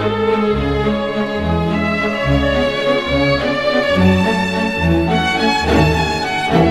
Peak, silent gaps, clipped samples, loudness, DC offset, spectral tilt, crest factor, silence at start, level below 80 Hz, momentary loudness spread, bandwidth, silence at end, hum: 0 dBFS; none; under 0.1%; -15 LUFS; 0.6%; -6 dB/octave; 14 dB; 0 s; -28 dBFS; 4 LU; 14 kHz; 0 s; none